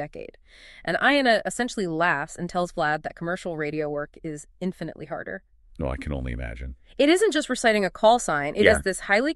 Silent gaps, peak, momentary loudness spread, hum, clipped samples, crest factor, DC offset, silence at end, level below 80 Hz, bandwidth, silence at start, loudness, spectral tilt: none; -2 dBFS; 17 LU; none; under 0.1%; 22 dB; under 0.1%; 0 s; -42 dBFS; 13 kHz; 0 s; -24 LUFS; -4 dB/octave